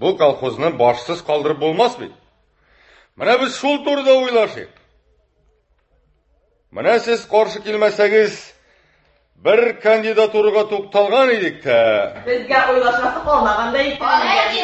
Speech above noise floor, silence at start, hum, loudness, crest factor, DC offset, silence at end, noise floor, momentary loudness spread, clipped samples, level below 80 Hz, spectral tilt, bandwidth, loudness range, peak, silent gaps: 45 dB; 0 s; none; -16 LUFS; 16 dB; under 0.1%; 0 s; -61 dBFS; 7 LU; under 0.1%; -50 dBFS; -4.5 dB/octave; 8.4 kHz; 5 LU; -2 dBFS; none